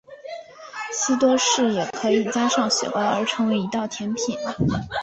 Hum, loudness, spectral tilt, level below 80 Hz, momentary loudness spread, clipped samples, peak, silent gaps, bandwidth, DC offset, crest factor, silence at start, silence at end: none; -22 LUFS; -3.5 dB/octave; -50 dBFS; 16 LU; under 0.1%; -8 dBFS; none; 8.4 kHz; under 0.1%; 16 dB; 0.1 s; 0 s